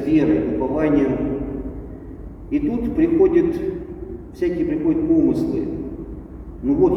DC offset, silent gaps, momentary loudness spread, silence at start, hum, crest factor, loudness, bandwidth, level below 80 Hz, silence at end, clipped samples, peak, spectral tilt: under 0.1%; none; 18 LU; 0 s; none; 14 dB; -20 LUFS; 6.2 kHz; -36 dBFS; 0 s; under 0.1%; -6 dBFS; -9.5 dB/octave